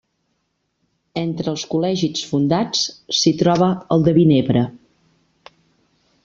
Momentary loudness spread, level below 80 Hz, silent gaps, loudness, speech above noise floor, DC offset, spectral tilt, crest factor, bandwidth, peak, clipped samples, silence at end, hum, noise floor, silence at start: 10 LU; -54 dBFS; none; -18 LUFS; 53 dB; under 0.1%; -5.5 dB/octave; 16 dB; 7.6 kHz; -2 dBFS; under 0.1%; 1.45 s; none; -71 dBFS; 1.15 s